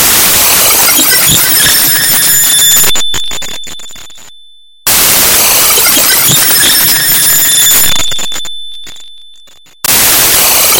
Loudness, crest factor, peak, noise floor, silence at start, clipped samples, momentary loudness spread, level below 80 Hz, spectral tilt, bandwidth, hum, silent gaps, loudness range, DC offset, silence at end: -4 LUFS; 8 dB; 0 dBFS; -40 dBFS; 0 s; 2%; 14 LU; -36 dBFS; 0 dB/octave; over 20 kHz; none; none; 4 LU; under 0.1%; 0 s